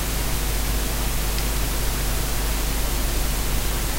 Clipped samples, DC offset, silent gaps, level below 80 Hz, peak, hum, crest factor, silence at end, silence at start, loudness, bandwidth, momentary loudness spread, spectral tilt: under 0.1%; under 0.1%; none; -24 dBFS; -10 dBFS; none; 12 dB; 0 s; 0 s; -24 LUFS; 16 kHz; 0 LU; -3.5 dB/octave